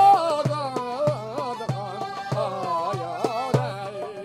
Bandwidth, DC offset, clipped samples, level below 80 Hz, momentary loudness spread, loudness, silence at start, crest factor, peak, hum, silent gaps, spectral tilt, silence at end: 14 kHz; under 0.1%; under 0.1%; -66 dBFS; 7 LU; -26 LUFS; 0 s; 18 dB; -6 dBFS; none; none; -6 dB/octave; 0 s